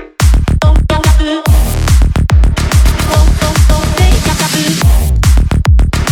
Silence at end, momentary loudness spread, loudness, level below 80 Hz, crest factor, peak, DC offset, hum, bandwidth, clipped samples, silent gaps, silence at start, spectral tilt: 0 s; 1 LU; -10 LUFS; -10 dBFS; 8 dB; 0 dBFS; under 0.1%; none; 17 kHz; under 0.1%; none; 0 s; -5 dB/octave